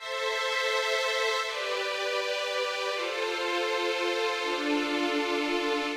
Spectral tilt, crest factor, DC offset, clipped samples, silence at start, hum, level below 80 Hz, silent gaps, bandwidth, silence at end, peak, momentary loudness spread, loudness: -0.5 dB/octave; 12 dB; under 0.1%; under 0.1%; 0 s; none; -70 dBFS; none; 16 kHz; 0 s; -16 dBFS; 3 LU; -28 LUFS